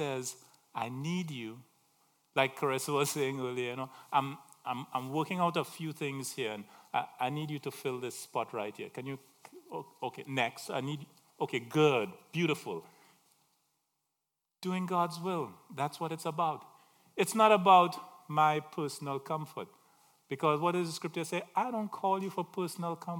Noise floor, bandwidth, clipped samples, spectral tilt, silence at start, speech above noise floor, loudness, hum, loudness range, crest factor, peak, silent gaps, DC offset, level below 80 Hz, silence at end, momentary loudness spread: -87 dBFS; 18 kHz; under 0.1%; -5 dB/octave; 0 s; 54 dB; -33 LUFS; none; 9 LU; 24 dB; -10 dBFS; none; under 0.1%; -86 dBFS; 0 s; 14 LU